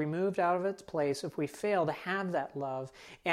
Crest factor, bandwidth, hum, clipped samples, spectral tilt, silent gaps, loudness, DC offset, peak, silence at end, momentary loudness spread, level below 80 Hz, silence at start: 20 dB; 15 kHz; none; under 0.1%; -6 dB/octave; none; -33 LUFS; under 0.1%; -14 dBFS; 0 s; 8 LU; -72 dBFS; 0 s